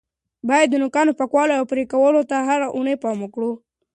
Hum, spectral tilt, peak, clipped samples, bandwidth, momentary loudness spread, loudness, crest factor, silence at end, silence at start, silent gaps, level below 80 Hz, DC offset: none; -4.5 dB/octave; -4 dBFS; under 0.1%; 9.8 kHz; 10 LU; -19 LUFS; 16 dB; 0.4 s; 0.45 s; none; -66 dBFS; under 0.1%